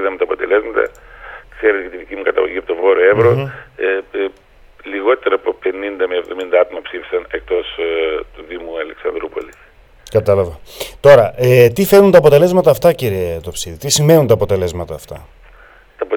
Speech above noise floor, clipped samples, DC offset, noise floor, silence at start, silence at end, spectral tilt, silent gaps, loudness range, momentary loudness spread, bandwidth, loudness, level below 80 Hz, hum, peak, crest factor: 33 dB; under 0.1%; under 0.1%; -45 dBFS; 0 s; 0 s; -5 dB/octave; none; 9 LU; 18 LU; 20 kHz; -14 LUFS; -42 dBFS; none; 0 dBFS; 14 dB